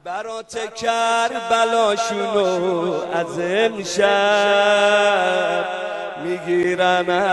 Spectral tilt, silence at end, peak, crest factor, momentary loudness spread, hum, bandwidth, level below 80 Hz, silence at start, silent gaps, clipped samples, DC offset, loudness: -3.5 dB/octave; 0 s; -4 dBFS; 14 dB; 11 LU; none; 11.5 kHz; -62 dBFS; 0.05 s; none; under 0.1%; under 0.1%; -19 LUFS